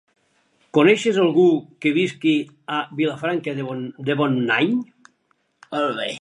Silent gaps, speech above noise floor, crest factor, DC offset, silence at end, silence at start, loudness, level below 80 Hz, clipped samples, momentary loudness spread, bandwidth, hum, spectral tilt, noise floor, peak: none; 47 dB; 20 dB; under 0.1%; 0.05 s; 0.75 s; -20 LUFS; -74 dBFS; under 0.1%; 11 LU; 11 kHz; none; -6 dB/octave; -67 dBFS; -2 dBFS